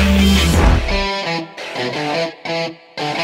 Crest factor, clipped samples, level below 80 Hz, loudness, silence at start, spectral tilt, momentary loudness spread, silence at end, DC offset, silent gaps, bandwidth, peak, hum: 16 dB; under 0.1%; -22 dBFS; -17 LUFS; 0 s; -5 dB/octave; 12 LU; 0 s; under 0.1%; none; 16.5 kHz; -2 dBFS; none